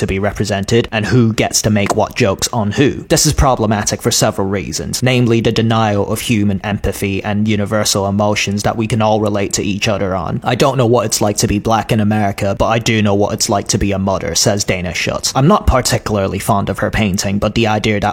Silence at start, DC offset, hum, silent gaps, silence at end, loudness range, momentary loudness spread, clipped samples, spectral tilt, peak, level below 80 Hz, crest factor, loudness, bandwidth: 0 s; under 0.1%; none; none; 0 s; 2 LU; 5 LU; under 0.1%; -4.5 dB/octave; 0 dBFS; -30 dBFS; 14 dB; -14 LUFS; 16.5 kHz